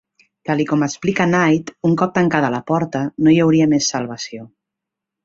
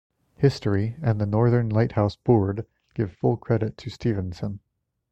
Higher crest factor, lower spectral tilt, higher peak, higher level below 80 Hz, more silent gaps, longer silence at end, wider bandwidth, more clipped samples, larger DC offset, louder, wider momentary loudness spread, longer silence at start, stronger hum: about the same, 16 dB vs 18 dB; second, -5.5 dB/octave vs -9 dB/octave; first, 0 dBFS vs -6 dBFS; second, -56 dBFS vs -50 dBFS; neither; first, 0.8 s vs 0.55 s; about the same, 7.8 kHz vs 8.2 kHz; neither; neither; first, -17 LUFS vs -24 LUFS; about the same, 13 LU vs 12 LU; about the same, 0.45 s vs 0.4 s; neither